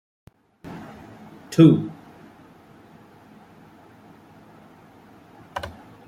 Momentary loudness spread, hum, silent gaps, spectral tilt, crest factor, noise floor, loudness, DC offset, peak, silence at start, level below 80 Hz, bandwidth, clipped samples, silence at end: 30 LU; none; none; -8 dB/octave; 24 dB; -50 dBFS; -19 LUFS; under 0.1%; -2 dBFS; 0.65 s; -60 dBFS; 13.5 kHz; under 0.1%; 0.4 s